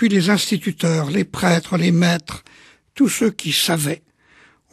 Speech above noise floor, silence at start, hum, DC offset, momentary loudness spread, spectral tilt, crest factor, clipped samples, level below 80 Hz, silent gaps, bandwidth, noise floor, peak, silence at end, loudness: 35 dB; 0 s; none; under 0.1%; 8 LU; -4.5 dB/octave; 18 dB; under 0.1%; -54 dBFS; none; 13 kHz; -53 dBFS; -2 dBFS; 0.75 s; -18 LUFS